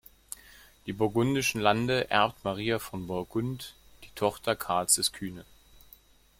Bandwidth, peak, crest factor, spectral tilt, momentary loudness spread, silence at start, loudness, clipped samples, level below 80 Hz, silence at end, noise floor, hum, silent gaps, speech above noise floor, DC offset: 16.5 kHz; -8 dBFS; 22 dB; -3.5 dB/octave; 19 LU; 0.85 s; -28 LUFS; under 0.1%; -58 dBFS; 0.95 s; -58 dBFS; none; none; 29 dB; under 0.1%